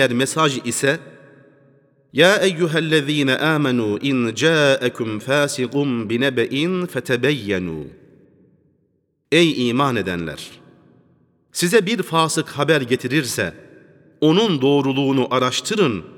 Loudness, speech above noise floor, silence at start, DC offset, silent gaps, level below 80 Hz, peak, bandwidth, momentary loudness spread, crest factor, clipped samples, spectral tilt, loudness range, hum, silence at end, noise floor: -19 LUFS; 48 dB; 0 s; under 0.1%; none; -60 dBFS; 0 dBFS; 18.5 kHz; 9 LU; 18 dB; under 0.1%; -4.5 dB/octave; 4 LU; none; 0.05 s; -66 dBFS